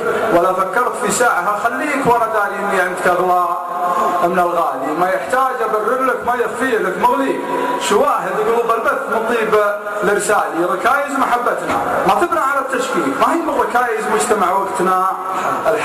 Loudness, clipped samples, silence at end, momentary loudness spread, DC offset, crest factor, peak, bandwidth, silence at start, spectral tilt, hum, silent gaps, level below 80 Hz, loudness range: -16 LUFS; under 0.1%; 0 s; 4 LU; under 0.1%; 14 dB; -2 dBFS; 15 kHz; 0 s; -4 dB/octave; none; none; -52 dBFS; 1 LU